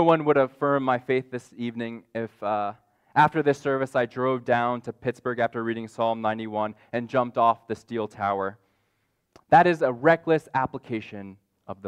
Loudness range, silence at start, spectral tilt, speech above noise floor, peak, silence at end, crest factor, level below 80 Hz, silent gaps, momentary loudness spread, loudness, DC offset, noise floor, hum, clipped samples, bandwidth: 3 LU; 0 s; -7 dB/octave; 48 dB; -6 dBFS; 0 s; 20 dB; -66 dBFS; none; 13 LU; -25 LUFS; under 0.1%; -73 dBFS; none; under 0.1%; 11.5 kHz